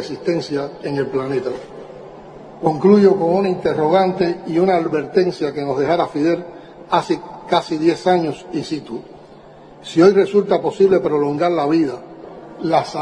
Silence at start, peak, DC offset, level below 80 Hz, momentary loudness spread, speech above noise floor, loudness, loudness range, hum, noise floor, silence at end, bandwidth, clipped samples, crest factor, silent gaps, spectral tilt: 0 s; -2 dBFS; under 0.1%; -56 dBFS; 20 LU; 25 dB; -18 LUFS; 4 LU; none; -41 dBFS; 0 s; 10 kHz; under 0.1%; 16 dB; none; -7 dB/octave